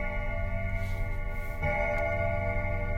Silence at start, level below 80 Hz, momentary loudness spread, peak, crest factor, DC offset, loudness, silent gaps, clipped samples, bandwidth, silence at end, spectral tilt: 0 s; -34 dBFS; 7 LU; -18 dBFS; 12 dB; under 0.1%; -32 LUFS; none; under 0.1%; 15 kHz; 0 s; -7.5 dB/octave